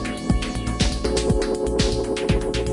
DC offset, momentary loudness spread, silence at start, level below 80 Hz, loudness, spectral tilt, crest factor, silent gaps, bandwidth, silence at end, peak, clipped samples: under 0.1%; 3 LU; 0 s; -28 dBFS; -23 LUFS; -5 dB/octave; 16 dB; none; 11 kHz; 0 s; -6 dBFS; under 0.1%